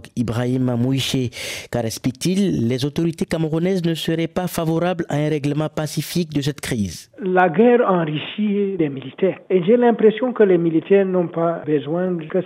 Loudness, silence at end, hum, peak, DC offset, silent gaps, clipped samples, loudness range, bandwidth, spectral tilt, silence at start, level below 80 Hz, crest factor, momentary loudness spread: -20 LUFS; 0 s; none; -2 dBFS; under 0.1%; none; under 0.1%; 4 LU; 16 kHz; -6 dB/octave; 0.05 s; -52 dBFS; 16 dB; 9 LU